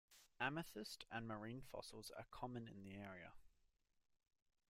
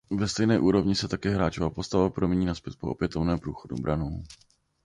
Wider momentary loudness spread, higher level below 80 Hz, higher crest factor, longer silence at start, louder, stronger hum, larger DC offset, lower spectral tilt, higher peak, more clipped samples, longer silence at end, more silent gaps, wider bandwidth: about the same, 11 LU vs 12 LU; second, -74 dBFS vs -44 dBFS; first, 26 dB vs 16 dB; about the same, 0.1 s vs 0.1 s; second, -52 LUFS vs -27 LUFS; neither; neither; second, -4.5 dB/octave vs -6 dB/octave; second, -28 dBFS vs -10 dBFS; neither; first, 1.2 s vs 0.5 s; neither; first, 16 kHz vs 11 kHz